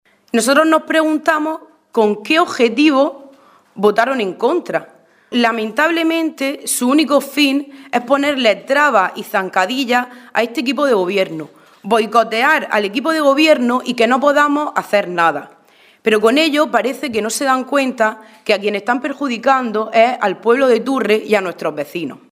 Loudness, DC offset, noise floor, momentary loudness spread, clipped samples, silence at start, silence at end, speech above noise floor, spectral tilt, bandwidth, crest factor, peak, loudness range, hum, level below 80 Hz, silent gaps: -15 LUFS; under 0.1%; -48 dBFS; 9 LU; under 0.1%; 0.35 s; 0.15 s; 33 dB; -3.5 dB/octave; 16 kHz; 16 dB; 0 dBFS; 3 LU; none; -68 dBFS; none